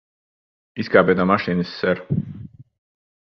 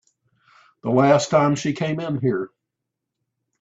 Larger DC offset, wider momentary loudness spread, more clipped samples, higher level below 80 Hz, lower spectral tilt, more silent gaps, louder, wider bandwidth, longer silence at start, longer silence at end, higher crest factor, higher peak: neither; first, 19 LU vs 12 LU; neither; first, -50 dBFS vs -62 dBFS; first, -8.5 dB/octave vs -6 dB/octave; neither; about the same, -20 LUFS vs -20 LUFS; second, 6.2 kHz vs 8 kHz; about the same, 0.75 s vs 0.85 s; second, 0.65 s vs 1.15 s; about the same, 22 dB vs 20 dB; first, 0 dBFS vs -4 dBFS